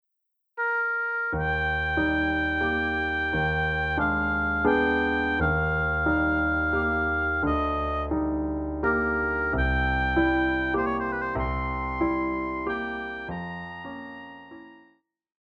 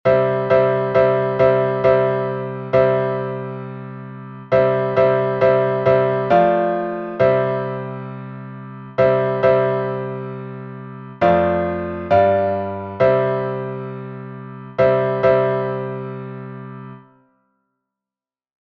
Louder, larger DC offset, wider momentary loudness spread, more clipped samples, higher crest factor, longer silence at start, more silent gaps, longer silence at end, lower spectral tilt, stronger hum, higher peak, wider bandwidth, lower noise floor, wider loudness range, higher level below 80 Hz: second, -26 LUFS vs -18 LUFS; neither; second, 10 LU vs 17 LU; neither; about the same, 16 dB vs 16 dB; first, 0.55 s vs 0.05 s; neither; second, 0.8 s vs 1.75 s; about the same, -8 dB/octave vs -9 dB/octave; neither; second, -10 dBFS vs -2 dBFS; about the same, 6.6 kHz vs 6 kHz; second, -79 dBFS vs under -90 dBFS; about the same, 6 LU vs 4 LU; first, -36 dBFS vs -52 dBFS